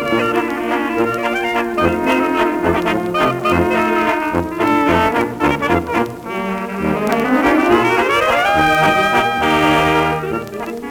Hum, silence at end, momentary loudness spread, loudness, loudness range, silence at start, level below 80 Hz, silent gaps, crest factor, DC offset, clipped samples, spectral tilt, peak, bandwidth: none; 0 s; 7 LU; -16 LUFS; 3 LU; 0 s; -42 dBFS; none; 14 dB; under 0.1%; under 0.1%; -5.5 dB/octave; 0 dBFS; over 20 kHz